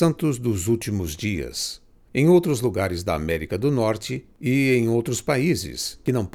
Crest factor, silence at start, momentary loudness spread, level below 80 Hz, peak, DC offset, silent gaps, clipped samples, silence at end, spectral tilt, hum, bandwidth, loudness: 16 dB; 0 s; 10 LU; -44 dBFS; -6 dBFS; under 0.1%; none; under 0.1%; 0.05 s; -5.5 dB/octave; none; 17.5 kHz; -23 LUFS